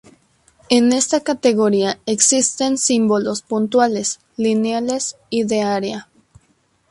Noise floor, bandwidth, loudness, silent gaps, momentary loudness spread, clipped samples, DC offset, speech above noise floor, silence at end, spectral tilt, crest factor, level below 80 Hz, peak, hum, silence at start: -61 dBFS; 11.5 kHz; -17 LUFS; none; 8 LU; under 0.1%; under 0.1%; 44 dB; 0.9 s; -3 dB/octave; 18 dB; -60 dBFS; 0 dBFS; none; 0.7 s